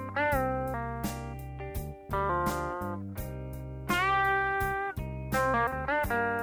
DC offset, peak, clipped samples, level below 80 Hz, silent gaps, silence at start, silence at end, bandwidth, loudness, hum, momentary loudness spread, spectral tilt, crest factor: under 0.1%; -16 dBFS; under 0.1%; -44 dBFS; none; 0 s; 0 s; 19.5 kHz; -31 LUFS; none; 12 LU; -5.5 dB/octave; 14 dB